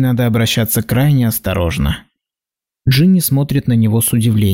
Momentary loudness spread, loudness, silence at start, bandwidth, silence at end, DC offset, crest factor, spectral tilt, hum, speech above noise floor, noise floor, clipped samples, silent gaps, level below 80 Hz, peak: 7 LU; -14 LUFS; 0 s; 16.5 kHz; 0 s; 0.2%; 10 dB; -5.5 dB/octave; none; 75 dB; -88 dBFS; under 0.1%; none; -34 dBFS; -4 dBFS